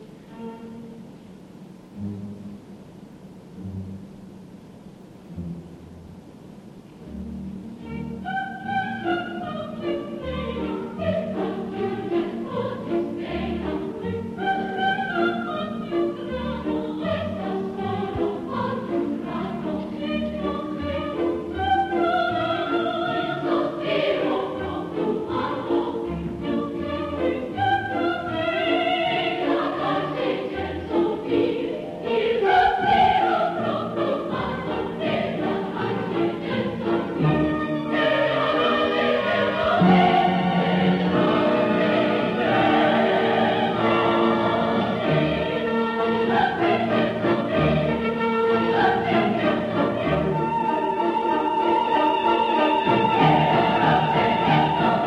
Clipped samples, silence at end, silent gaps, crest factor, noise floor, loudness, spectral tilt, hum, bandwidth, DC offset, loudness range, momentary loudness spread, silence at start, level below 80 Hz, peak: under 0.1%; 0 s; none; 16 dB; -44 dBFS; -23 LUFS; -7.5 dB/octave; none; 11 kHz; under 0.1%; 17 LU; 15 LU; 0 s; -48 dBFS; -6 dBFS